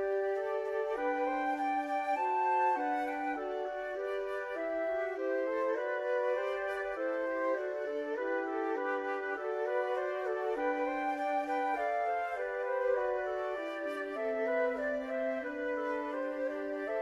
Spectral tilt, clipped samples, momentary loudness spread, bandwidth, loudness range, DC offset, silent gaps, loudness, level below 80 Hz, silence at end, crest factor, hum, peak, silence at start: -4 dB/octave; under 0.1%; 5 LU; 12 kHz; 2 LU; under 0.1%; none; -34 LUFS; -70 dBFS; 0 s; 14 dB; none; -20 dBFS; 0 s